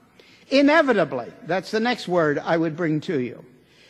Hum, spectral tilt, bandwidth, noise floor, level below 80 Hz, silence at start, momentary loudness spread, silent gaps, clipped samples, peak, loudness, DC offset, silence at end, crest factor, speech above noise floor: none; -6 dB/octave; 12 kHz; -52 dBFS; -66 dBFS; 0.5 s; 11 LU; none; under 0.1%; -6 dBFS; -22 LUFS; under 0.1%; 0.5 s; 18 dB; 31 dB